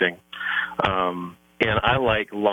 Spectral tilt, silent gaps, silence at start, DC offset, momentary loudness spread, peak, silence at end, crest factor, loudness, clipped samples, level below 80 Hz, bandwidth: -6.5 dB/octave; none; 0 s; under 0.1%; 11 LU; -6 dBFS; 0 s; 18 dB; -23 LUFS; under 0.1%; -46 dBFS; 18.5 kHz